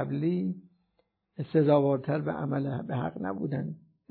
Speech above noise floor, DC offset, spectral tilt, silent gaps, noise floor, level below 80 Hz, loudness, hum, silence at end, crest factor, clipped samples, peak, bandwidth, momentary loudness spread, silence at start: 46 dB; under 0.1%; -12 dB/octave; none; -75 dBFS; -68 dBFS; -29 LUFS; none; 0.3 s; 18 dB; under 0.1%; -12 dBFS; 4.5 kHz; 17 LU; 0 s